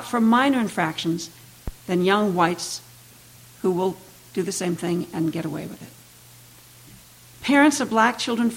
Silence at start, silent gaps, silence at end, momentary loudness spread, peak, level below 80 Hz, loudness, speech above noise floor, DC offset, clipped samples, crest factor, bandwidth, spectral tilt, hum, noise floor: 0 s; none; 0 s; 19 LU; -4 dBFS; -50 dBFS; -22 LUFS; 27 dB; under 0.1%; under 0.1%; 18 dB; 17 kHz; -4.5 dB/octave; none; -48 dBFS